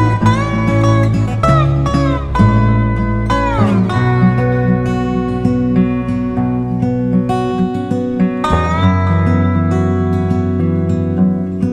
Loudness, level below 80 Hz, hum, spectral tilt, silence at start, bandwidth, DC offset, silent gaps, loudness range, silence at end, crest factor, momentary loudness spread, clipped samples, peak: -14 LUFS; -26 dBFS; none; -8.5 dB/octave; 0 s; 9.8 kHz; under 0.1%; none; 2 LU; 0 s; 14 dB; 4 LU; under 0.1%; 0 dBFS